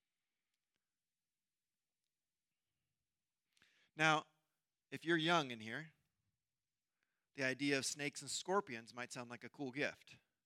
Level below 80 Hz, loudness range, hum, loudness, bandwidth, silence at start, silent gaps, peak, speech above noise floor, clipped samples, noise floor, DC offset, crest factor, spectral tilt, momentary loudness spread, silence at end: under -90 dBFS; 3 LU; none; -40 LUFS; 15.5 kHz; 3.95 s; none; -18 dBFS; over 49 dB; under 0.1%; under -90 dBFS; under 0.1%; 26 dB; -3.5 dB/octave; 18 LU; 0.3 s